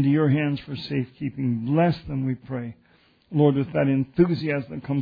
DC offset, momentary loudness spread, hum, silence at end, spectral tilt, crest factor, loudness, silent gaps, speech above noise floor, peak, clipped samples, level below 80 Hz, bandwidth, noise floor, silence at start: under 0.1%; 10 LU; none; 0 s; -10.5 dB/octave; 18 dB; -24 LUFS; none; 31 dB; -6 dBFS; under 0.1%; -54 dBFS; 5 kHz; -54 dBFS; 0 s